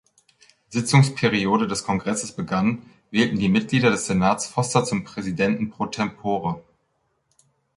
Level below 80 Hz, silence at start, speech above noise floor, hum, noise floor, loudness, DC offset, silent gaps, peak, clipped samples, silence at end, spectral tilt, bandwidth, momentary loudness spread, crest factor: -54 dBFS; 0.7 s; 49 dB; none; -70 dBFS; -22 LUFS; under 0.1%; none; -4 dBFS; under 0.1%; 1.15 s; -5 dB/octave; 11.5 kHz; 8 LU; 20 dB